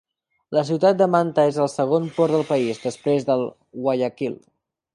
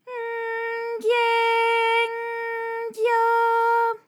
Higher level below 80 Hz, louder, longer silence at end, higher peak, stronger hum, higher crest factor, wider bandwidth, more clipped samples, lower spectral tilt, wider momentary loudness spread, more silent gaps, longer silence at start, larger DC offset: first, -68 dBFS vs under -90 dBFS; about the same, -21 LUFS vs -22 LUFS; first, 0.6 s vs 0.1 s; first, -4 dBFS vs -12 dBFS; neither; first, 18 dB vs 12 dB; second, 11.5 kHz vs 16 kHz; neither; first, -6.5 dB/octave vs -0.5 dB/octave; about the same, 9 LU vs 9 LU; neither; first, 0.5 s vs 0.05 s; neither